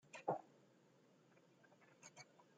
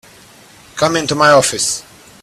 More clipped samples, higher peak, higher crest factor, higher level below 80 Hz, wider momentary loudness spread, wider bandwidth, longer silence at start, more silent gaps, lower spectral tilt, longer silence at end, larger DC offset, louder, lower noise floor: neither; second, -26 dBFS vs 0 dBFS; first, 30 dB vs 16 dB; second, under -90 dBFS vs -50 dBFS; first, 18 LU vs 12 LU; second, 9 kHz vs 14.5 kHz; second, 0.15 s vs 0.75 s; neither; first, -5 dB/octave vs -2.5 dB/octave; second, 0.15 s vs 0.4 s; neither; second, -49 LUFS vs -13 LUFS; first, -72 dBFS vs -42 dBFS